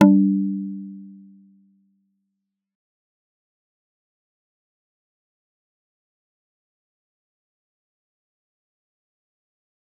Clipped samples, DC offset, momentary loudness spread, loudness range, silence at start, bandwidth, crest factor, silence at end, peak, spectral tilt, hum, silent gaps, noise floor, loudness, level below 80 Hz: under 0.1%; under 0.1%; 25 LU; 23 LU; 0 s; 3.6 kHz; 26 dB; 8.9 s; -2 dBFS; -9 dB/octave; none; none; -80 dBFS; -20 LUFS; -78 dBFS